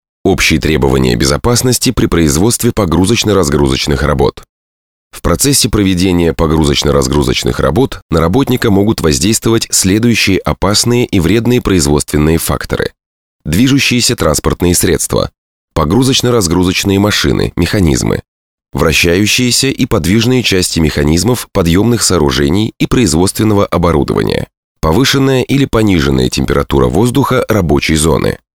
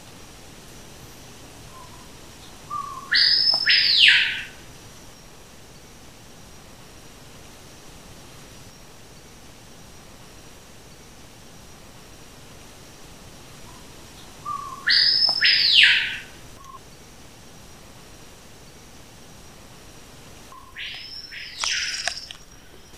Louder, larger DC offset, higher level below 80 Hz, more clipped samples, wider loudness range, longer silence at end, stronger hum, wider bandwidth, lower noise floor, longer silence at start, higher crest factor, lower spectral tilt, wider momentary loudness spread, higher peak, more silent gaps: first, -11 LUFS vs -17 LUFS; second, under 0.1% vs 0.3%; first, -24 dBFS vs -54 dBFS; neither; second, 2 LU vs 21 LU; first, 0.25 s vs 0 s; neither; first, 18 kHz vs 15.5 kHz; first, under -90 dBFS vs -47 dBFS; first, 0.25 s vs 0.05 s; second, 10 dB vs 26 dB; first, -4.5 dB/octave vs 0 dB/octave; second, 5 LU vs 30 LU; about the same, 0 dBFS vs 0 dBFS; first, 4.49-5.10 s, 8.02-8.09 s, 13.06-13.39 s, 15.38-15.68 s, 18.28-18.58 s, 24.57-24.75 s vs none